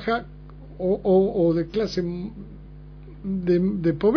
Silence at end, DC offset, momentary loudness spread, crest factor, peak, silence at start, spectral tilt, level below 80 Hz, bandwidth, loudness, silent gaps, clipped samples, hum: 0 s; under 0.1%; 24 LU; 16 dB; -8 dBFS; 0 s; -8.5 dB/octave; -44 dBFS; 5.4 kHz; -23 LUFS; none; under 0.1%; 50 Hz at -40 dBFS